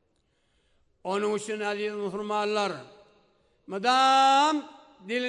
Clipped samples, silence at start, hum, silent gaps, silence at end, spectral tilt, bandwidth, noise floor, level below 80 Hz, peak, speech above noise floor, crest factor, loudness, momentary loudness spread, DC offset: under 0.1%; 1.05 s; none; none; 0 s; -3 dB/octave; 11 kHz; -71 dBFS; -74 dBFS; -12 dBFS; 45 dB; 16 dB; -25 LUFS; 13 LU; under 0.1%